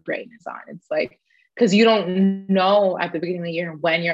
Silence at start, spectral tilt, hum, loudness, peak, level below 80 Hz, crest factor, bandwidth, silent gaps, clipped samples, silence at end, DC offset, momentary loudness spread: 0.05 s; -6 dB/octave; none; -20 LUFS; -4 dBFS; -68 dBFS; 16 dB; 8 kHz; none; under 0.1%; 0 s; under 0.1%; 17 LU